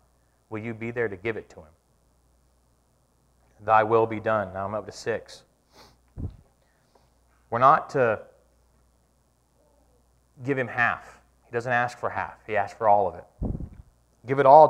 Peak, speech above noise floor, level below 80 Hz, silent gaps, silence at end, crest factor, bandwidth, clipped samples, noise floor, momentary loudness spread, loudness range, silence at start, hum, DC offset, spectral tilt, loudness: -2 dBFS; 43 dB; -50 dBFS; none; 0 s; 24 dB; 10.5 kHz; under 0.1%; -66 dBFS; 18 LU; 7 LU; 0.5 s; none; under 0.1%; -6.5 dB/octave; -25 LUFS